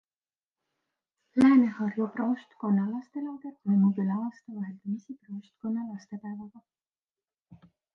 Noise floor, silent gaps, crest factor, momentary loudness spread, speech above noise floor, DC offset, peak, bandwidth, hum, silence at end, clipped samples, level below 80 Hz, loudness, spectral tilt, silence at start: under -90 dBFS; none; 18 dB; 18 LU; over 62 dB; under 0.1%; -12 dBFS; 6.6 kHz; none; 0.4 s; under 0.1%; -72 dBFS; -28 LUFS; -9 dB/octave; 1.35 s